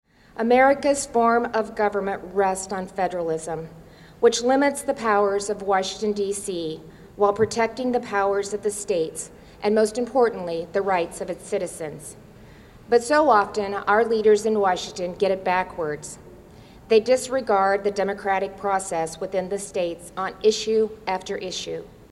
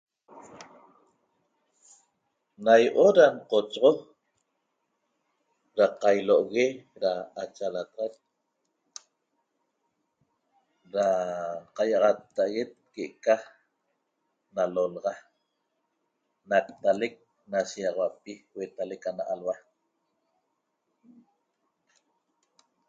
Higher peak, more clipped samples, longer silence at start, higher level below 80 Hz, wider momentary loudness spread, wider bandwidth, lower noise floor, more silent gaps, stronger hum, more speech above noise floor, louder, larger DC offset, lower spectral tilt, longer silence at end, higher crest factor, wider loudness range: about the same, -4 dBFS vs -6 dBFS; neither; about the same, 0.35 s vs 0.35 s; first, -54 dBFS vs -78 dBFS; second, 12 LU vs 18 LU; first, 13 kHz vs 7.8 kHz; second, -46 dBFS vs -79 dBFS; neither; neither; second, 24 dB vs 53 dB; first, -23 LUFS vs -26 LUFS; neither; about the same, -4 dB/octave vs -4.5 dB/octave; second, 0.2 s vs 3.3 s; second, 18 dB vs 24 dB; second, 4 LU vs 14 LU